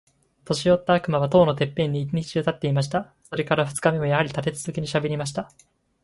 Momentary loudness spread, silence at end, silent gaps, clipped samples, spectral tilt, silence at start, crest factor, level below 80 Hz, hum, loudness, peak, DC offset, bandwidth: 10 LU; 0.6 s; none; under 0.1%; -6 dB/octave; 0.45 s; 20 dB; -54 dBFS; none; -23 LUFS; -4 dBFS; under 0.1%; 11.5 kHz